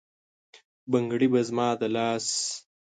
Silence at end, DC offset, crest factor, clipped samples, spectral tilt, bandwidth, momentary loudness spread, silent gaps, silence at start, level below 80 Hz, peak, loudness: 0.35 s; under 0.1%; 18 dB; under 0.1%; -4 dB/octave; 9.6 kHz; 8 LU; 0.65-0.87 s; 0.55 s; -74 dBFS; -10 dBFS; -26 LUFS